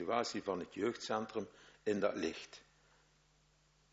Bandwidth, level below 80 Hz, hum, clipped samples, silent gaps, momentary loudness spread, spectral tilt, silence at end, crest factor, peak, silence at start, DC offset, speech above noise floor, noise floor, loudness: 7.6 kHz; -74 dBFS; none; under 0.1%; none; 15 LU; -3.5 dB/octave; 1.35 s; 20 dB; -20 dBFS; 0 s; under 0.1%; 33 dB; -72 dBFS; -40 LUFS